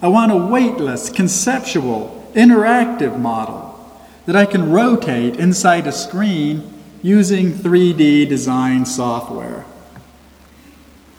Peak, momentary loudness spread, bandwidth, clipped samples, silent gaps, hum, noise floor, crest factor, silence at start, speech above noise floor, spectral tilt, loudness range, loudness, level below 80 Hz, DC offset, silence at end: 0 dBFS; 13 LU; 16 kHz; under 0.1%; none; none; -45 dBFS; 16 dB; 0 s; 30 dB; -5.5 dB/octave; 2 LU; -15 LUFS; -52 dBFS; under 0.1%; 1.2 s